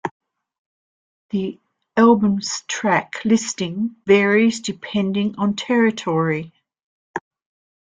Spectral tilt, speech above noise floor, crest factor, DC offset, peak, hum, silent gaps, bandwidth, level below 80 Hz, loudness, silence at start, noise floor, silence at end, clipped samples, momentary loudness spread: -5 dB/octave; over 71 dB; 18 dB; under 0.1%; -2 dBFS; none; 0.11-0.20 s, 0.59-1.29 s, 6.83-7.14 s; 9.4 kHz; -62 dBFS; -19 LUFS; 0.05 s; under -90 dBFS; 0.65 s; under 0.1%; 16 LU